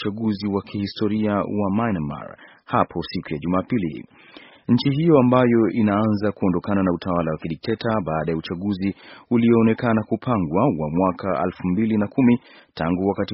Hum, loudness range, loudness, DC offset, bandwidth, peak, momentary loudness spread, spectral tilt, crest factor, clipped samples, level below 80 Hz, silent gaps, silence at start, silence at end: none; 5 LU; -21 LUFS; under 0.1%; 5.8 kHz; -2 dBFS; 11 LU; -6.5 dB/octave; 18 dB; under 0.1%; -50 dBFS; none; 0 s; 0 s